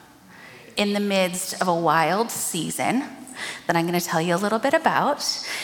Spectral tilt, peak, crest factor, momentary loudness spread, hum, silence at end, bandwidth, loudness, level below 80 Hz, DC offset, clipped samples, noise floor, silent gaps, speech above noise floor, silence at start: -3.5 dB/octave; -4 dBFS; 20 dB; 8 LU; none; 0 s; 17.5 kHz; -23 LUFS; -68 dBFS; under 0.1%; under 0.1%; -47 dBFS; none; 24 dB; 0.3 s